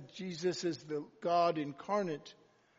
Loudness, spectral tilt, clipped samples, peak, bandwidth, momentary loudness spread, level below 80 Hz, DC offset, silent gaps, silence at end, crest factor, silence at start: -36 LUFS; -4.5 dB/octave; under 0.1%; -20 dBFS; 7.6 kHz; 12 LU; -82 dBFS; under 0.1%; none; 0.45 s; 16 dB; 0 s